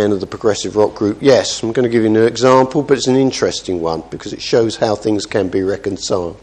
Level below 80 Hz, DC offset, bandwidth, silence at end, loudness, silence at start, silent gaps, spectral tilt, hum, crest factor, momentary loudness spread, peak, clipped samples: -46 dBFS; under 0.1%; 9.8 kHz; 0.05 s; -15 LUFS; 0 s; none; -5 dB/octave; none; 14 dB; 8 LU; 0 dBFS; under 0.1%